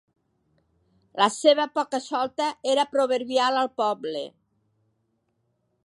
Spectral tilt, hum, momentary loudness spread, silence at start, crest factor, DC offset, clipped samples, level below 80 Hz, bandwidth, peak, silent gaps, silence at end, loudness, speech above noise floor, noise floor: -2.5 dB/octave; none; 11 LU; 1.15 s; 20 dB; under 0.1%; under 0.1%; -76 dBFS; 11.5 kHz; -6 dBFS; none; 1.55 s; -24 LUFS; 49 dB; -73 dBFS